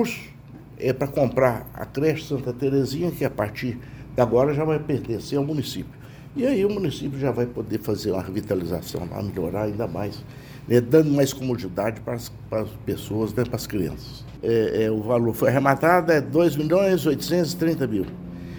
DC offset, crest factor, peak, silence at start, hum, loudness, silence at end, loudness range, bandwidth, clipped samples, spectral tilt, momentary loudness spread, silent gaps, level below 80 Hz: under 0.1%; 20 dB; -4 dBFS; 0 s; none; -24 LUFS; 0 s; 6 LU; over 20 kHz; under 0.1%; -6.5 dB/octave; 13 LU; none; -48 dBFS